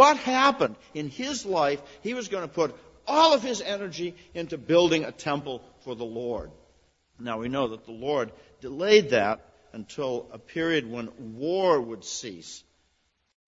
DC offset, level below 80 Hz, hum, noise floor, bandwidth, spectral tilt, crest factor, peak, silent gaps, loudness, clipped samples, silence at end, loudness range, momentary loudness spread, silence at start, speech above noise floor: under 0.1%; -60 dBFS; none; -71 dBFS; 8 kHz; -4 dB/octave; 24 dB; -4 dBFS; none; -26 LUFS; under 0.1%; 0.9 s; 6 LU; 19 LU; 0 s; 45 dB